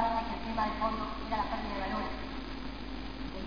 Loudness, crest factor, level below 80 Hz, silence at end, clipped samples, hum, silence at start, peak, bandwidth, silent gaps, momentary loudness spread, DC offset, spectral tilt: -36 LUFS; 16 dB; -44 dBFS; 0 s; under 0.1%; none; 0 s; -18 dBFS; 5.4 kHz; none; 9 LU; 0.5%; -6.5 dB/octave